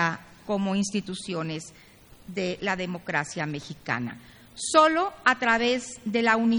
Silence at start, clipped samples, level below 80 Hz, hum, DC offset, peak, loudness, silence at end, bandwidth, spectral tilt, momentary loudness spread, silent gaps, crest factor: 0 s; under 0.1%; -60 dBFS; none; under 0.1%; -4 dBFS; -26 LUFS; 0 s; over 20 kHz; -4 dB/octave; 16 LU; none; 22 dB